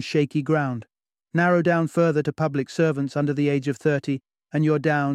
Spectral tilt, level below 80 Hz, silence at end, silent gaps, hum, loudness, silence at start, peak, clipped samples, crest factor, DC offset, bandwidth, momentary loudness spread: -7.5 dB/octave; -66 dBFS; 0 s; none; none; -23 LUFS; 0 s; -6 dBFS; under 0.1%; 16 dB; under 0.1%; 11 kHz; 8 LU